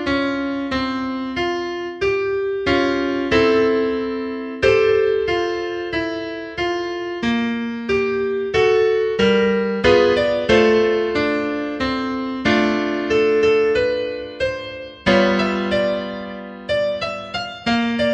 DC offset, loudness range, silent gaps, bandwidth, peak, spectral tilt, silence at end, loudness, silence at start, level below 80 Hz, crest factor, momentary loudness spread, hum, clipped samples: under 0.1%; 4 LU; none; 8.6 kHz; -2 dBFS; -5.5 dB/octave; 0 s; -19 LUFS; 0 s; -44 dBFS; 16 dB; 9 LU; none; under 0.1%